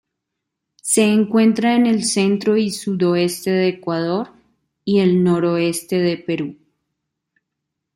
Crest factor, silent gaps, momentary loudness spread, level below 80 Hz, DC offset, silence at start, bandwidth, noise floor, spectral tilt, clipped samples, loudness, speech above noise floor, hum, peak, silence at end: 16 dB; none; 10 LU; -62 dBFS; under 0.1%; 0.85 s; 16 kHz; -79 dBFS; -5 dB/octave; under 0.1%; -18 LUFS; 62 dB; none; -4 dBFS; 1.4 s